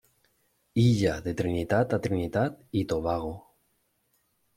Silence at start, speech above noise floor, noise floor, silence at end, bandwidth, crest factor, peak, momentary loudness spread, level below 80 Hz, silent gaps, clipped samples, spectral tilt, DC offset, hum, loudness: 0.75 s; 46 dB; -73 dBFS; 1.15 s; 14.5 kHz; 18 dB; -10 dBFS; 9 LU; -52 dBFS; none; under 0.1%; -7 dB/octave; under 0.1%; none; -28 LUFS